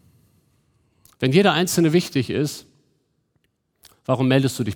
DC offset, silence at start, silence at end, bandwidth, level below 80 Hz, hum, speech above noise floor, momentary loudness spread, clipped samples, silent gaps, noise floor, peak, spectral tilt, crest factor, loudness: under 0.1%; 1.2 s; 0 s; 19 kHz; -62 dBFS; none; 50 dB; 10 LU; under 0.1%; none; -69 dBFS; -4 dBFS; -5.5 dB/octave; 20 dB; -20 LUFS